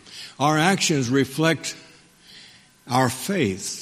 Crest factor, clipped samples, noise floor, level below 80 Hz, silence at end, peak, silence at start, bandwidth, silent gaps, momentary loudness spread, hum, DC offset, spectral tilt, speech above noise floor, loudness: 20 dB; under 0.1%; -50 dBFS; -60 dBFS; 0 s; -2 dBFS; 0.05 s; 15.5 kHz; none; 10 LU; none; under 0.1%; -4 dB/octave; 29 dB; -22 LUFS